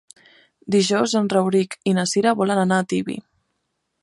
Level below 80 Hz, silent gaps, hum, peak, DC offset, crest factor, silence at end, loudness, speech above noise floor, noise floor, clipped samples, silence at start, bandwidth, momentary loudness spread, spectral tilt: -66 dBFS; none; none; -4 dBFS; under 0.1%; 16 dB; 0.8 s; -20 LUFS; 55 dB; -75 dBFS; under 0.1%; 0.65 s; 11.5 kHz; 6 LU; -5 dB/octave